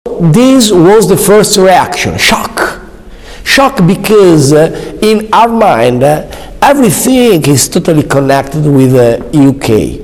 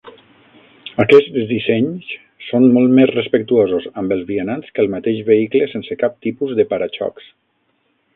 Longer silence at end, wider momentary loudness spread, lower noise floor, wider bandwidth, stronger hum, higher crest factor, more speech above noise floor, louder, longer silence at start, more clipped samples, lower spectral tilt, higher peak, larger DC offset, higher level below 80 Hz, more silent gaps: second, 0 s vs 1.05 s; second, 7 LU vs 13 LU; second, -28 dBFS vs -64 dBFS; first, over 20 kHz vs 5 kHz; neither; second, 6 dB vs 16 dB; second, 22 dB vs 49 dB; first, -7 LUFS vs -16 LUFS; about the same, 0.05 s vs 0.05 s; first, 9% vs under 0.1%; second, -5 dB/octave vs -8.5 dB/octave; about the same, 0 dBFS vs 0 dBFS; neither; first, -30 dBFS vs -56 dBFS; neither